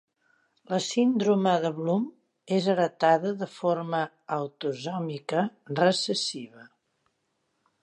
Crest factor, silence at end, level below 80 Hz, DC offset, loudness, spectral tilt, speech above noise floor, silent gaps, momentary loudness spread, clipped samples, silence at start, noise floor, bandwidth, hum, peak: 18 dB; 1.15 s; -80 dBFS; under 0.1%; -27 LUFS; -5 dB/octave; 49 dB; none; 9 LU; under 0.1%; 0.7 s; -76 dBFS; 10.5 kHz; none; -8 dBFS